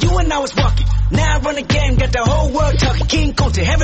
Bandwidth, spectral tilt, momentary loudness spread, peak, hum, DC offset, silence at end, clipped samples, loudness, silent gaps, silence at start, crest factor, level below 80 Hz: 8.6 kHz; -5 dB/octave; 2 LU; -2 dBFS; none; under 0.1%; 0 s; under 0.1%; -16 LUFS; none; 0 s; 12 dB; -18 dBFS